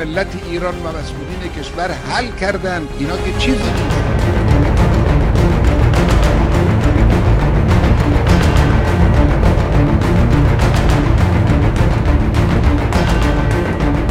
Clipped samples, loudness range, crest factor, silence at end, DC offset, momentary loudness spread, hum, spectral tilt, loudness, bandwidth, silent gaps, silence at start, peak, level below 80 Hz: under 0.1%; 6 LU; 12 dB; 0 s; under 0.1%; 8 LU; none; -7 dB/octave; -14 LUFS; 13 kHz; none; 0 s; 0 dBFS; -16 dBFS